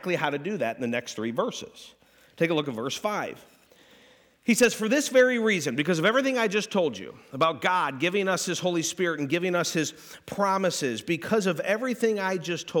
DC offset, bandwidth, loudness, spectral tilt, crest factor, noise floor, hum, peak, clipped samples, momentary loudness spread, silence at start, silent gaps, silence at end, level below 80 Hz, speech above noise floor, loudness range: under 0.1%; 19 kHz; -26 LUFS; -4 dB/octave; 16 dB; -58 dBFS; none; -10 dBFS; under 0.1%; 9 LU; 0 s; none; 0 s; -72 dBFS; 31 dB; 6 LU